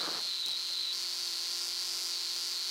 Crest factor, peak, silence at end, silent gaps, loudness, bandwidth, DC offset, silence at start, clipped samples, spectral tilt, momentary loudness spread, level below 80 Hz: 18 dB; -18 dBFS; 0 s; none; -32 LUFS; 16 kHz; under 0.1%; 0 s; under 0.1%; 2 dB/octave; 1 LU; -86 dBFS